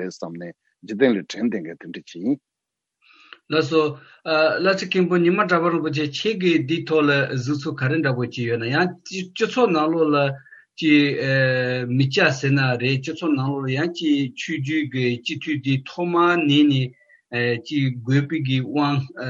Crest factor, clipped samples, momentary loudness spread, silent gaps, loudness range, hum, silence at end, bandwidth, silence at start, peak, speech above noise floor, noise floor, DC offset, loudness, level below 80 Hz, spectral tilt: 18 dB; under 0.1%; 10 LU; none; 5 LU; none; 0 s; 7.6 kHz; 0 s; -4 dBFS; 63 dB; -84 dBFS; under 0.1%; -21 LUFS; -70 dBFS; -6.5 dB/octave